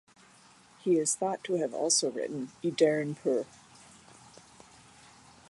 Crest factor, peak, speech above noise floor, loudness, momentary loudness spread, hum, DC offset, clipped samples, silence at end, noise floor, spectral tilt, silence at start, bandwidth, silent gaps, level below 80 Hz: 22 dB; -12 dBFS; 29 dB; -29 LUFS; 10 LU; none; under 0.1%; under 0.1%; 2.05 s; -59 dBFS; -3.5 dB/octave; 0.85 s; 11.5 kHz; none; -76 dBFS